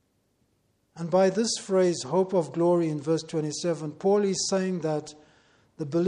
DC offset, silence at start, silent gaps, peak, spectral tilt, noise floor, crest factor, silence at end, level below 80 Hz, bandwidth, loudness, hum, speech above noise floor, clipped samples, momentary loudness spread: under 0.1%; 0.95 s; none; -10 dBFS; -5 dB/octave; -70 dBFS; 16 dB; 0 s; -70 dBFS; 10.5 kHz; -26 LUFS; none; 45 dB; under 0.1%; 7 LU